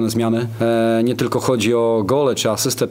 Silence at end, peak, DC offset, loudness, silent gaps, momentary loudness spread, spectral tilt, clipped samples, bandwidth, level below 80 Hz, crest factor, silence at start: 0 s; -2 dBFS; under 0.1%; -18 LUFS; none; 3 LU; -5 dB/octave; under 0.1%; 16.5 kHz; -56 dBFS; 14 dB; 0 s